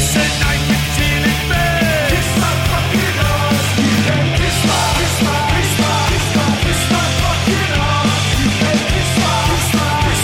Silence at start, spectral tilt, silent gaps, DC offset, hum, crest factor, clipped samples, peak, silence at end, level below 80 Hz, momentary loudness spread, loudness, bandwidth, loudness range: 0 s; -4 dB/octave; none; under 0.1%; none; 12 dB; under 0.1%; -2 dBFS; 0 s; -26 dBFS; 1 LU; -14 LUFS; 17 kHz; 0 LU